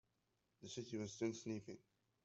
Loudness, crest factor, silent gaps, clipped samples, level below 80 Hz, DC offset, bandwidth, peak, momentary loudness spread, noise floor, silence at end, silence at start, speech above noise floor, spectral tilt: -48 LUFS; 20 dB; none; under 0.1%; -84 dBFS; under 0.1%; 8 kHz; -30 dBFS; 15 LU; -86 dBFS; 0.45 s; 0.6 s; 38 dB; -5 dB/octave